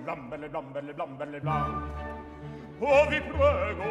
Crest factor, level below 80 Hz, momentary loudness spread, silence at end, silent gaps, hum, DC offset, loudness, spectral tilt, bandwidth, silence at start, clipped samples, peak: 20 dB; -46 dBFS; 18 LU; 0 s; none; none; under 0.1%; -28 LUFS; -6.5 dB/octave; 9.6 kHz; 0 s; under 0.1%; -10 dBFS